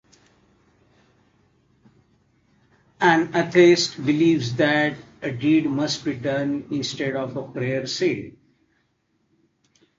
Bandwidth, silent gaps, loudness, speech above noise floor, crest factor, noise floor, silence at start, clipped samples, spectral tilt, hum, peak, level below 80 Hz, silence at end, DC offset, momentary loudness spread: 7.8 kHz; none; -21 LUFS; 48 dB; 20 dB; -69 dBFS; 3 s; under 0.1%; -5 dB/octave; none; -2 dBFS; -62 dBFS; 1.7 s; under 0.1%; 12 LU